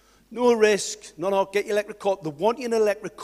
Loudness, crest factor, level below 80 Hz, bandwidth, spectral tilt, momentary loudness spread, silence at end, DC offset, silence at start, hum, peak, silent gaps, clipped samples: -24 LUFS; 20 dB; -64 dBFS; 14.5 kHz; -3.5 dB/octave; 8 LU; 0 s; under 0.1%; 0.3 s; none; -4 dBFS; none; under 0.1%